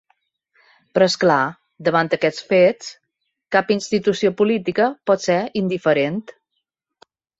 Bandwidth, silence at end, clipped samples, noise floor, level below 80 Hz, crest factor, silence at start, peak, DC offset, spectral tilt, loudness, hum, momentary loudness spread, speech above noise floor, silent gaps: 8 kHz; 1.2 s; under 0.1%; -76 dBFS; -64 dBFS; 18 dB; 0.95 s; -2 dBFS; under 0.1%; -5 dB/octave; -19 LUFS; none; 8 LU; 58 dB; none